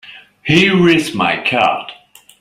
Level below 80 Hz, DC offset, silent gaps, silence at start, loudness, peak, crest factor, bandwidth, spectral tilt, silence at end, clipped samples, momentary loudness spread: -50 dBFS; under 0.1%; none; 0.05 s; -13 LUFS; 0 dBFS; 16 dB; 15 kHz; -5.5 dB/octave; 0.45 s; under 0.1%; 15 LU